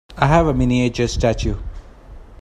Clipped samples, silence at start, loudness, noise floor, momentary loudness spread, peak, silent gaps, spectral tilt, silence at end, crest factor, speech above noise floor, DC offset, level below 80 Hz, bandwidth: under 0.1%; 0.1 s; -18 LUFS; -39 dBFS; 12 LU; 0 dBFS; none; -6.5 dB/octave; 0.05 s; 18 dB; 22 dB; under 0.1%; -28 dBFS; 11 kHz